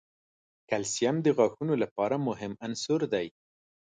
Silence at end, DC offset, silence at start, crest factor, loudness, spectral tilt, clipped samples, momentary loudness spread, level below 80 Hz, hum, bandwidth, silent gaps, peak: 0.65 s; under 0.1%; 0.7 s; 20 dB; -29 LUFS; -5 dB/octave; under 0.1%; 9 LU; -70 dBFS; none; 9.6 kHz; 1.91-1.96 s; -10 dBFS